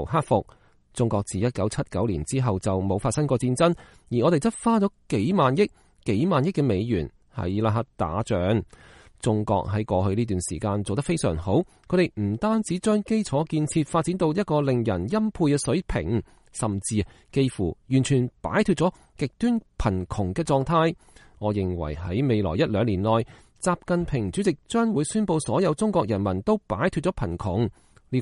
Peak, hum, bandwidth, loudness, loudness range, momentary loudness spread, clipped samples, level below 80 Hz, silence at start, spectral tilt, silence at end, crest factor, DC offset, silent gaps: -6 dBFS; none; 11.5 kHz; -25 LUFS; 3 LU; 6 LU; under 0.1%; -44 dBFS; 0 s; -6.5 dB/octave; 0 s; 18 dB; under 0.1%; none